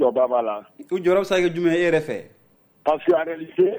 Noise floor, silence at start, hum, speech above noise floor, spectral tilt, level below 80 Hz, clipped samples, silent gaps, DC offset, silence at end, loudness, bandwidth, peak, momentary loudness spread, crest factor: -46 dBFS; 0 s; none; 25 dB; -6 dB/octave; -58 dBFS; under 0.1%; none; under 0.1%; 0 s; -21 LUFS; over 20 kHz; -6 dBFS; 10 LU; 14 dB